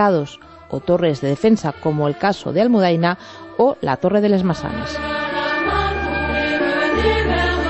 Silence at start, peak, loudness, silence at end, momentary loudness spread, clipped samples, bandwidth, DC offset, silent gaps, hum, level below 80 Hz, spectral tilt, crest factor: 0 s; -4 dBFS; -18 LUFS; 0 s; 8 LU; under 0.1%; 8.4 kHz; under 0.1%; none; none; -34 dBFS; -6.5 dB/octave; 14 dB